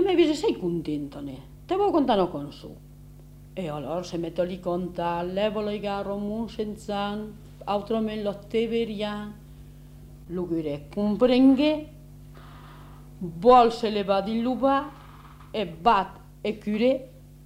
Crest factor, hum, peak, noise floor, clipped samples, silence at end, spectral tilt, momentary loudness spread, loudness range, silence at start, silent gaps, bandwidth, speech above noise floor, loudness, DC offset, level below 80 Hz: 22 dB; 50 Hz at -50 dBFS; -4 dBFS; -47 dBFS; under 0.1%; 0 s; -6.5 dB/octave; 20 LU; 7 LU; 0 s; none; 16 kHz; 22 dB; -26 LUFS; under 0.1%; -50 dBFS